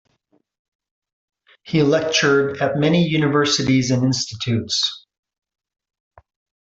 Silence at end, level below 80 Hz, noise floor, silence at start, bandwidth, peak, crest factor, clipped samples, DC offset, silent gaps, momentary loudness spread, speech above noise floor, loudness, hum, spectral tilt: 1.65 s; -56 dBFS; -65 dBFS; 1.65 s; 8.2 kHz; -4 dBFS; 18 dB; under 0.1%; under 0.1%; none; 6 LU; 47 dB; -18 LUFS; none; -4.5 dB/octave